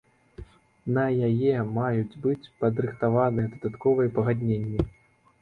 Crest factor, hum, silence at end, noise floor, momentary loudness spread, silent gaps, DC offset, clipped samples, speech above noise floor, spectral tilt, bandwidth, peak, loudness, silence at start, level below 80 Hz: 18 dB; none; 0.55 s; -46 dBFS; 6 LU; none; under 0.1%; under 0.1%; 22 dB; -10.5 dB/octave; 4.6 kHz; -8 dBFS; -26 LUFS; 0.4 s; -48 dBFS